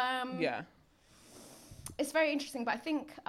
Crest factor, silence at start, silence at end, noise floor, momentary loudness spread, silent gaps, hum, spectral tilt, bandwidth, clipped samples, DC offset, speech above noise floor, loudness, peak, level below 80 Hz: 18 dB; 0 s; 0.1 s; -64 dBFS; 22 LU; none; none; -3.5 dB/octave; 16 kHz; under 0.1%; under 0.1%; 29 dB; -35 LUFS; -18 dBFS; -68 dBFS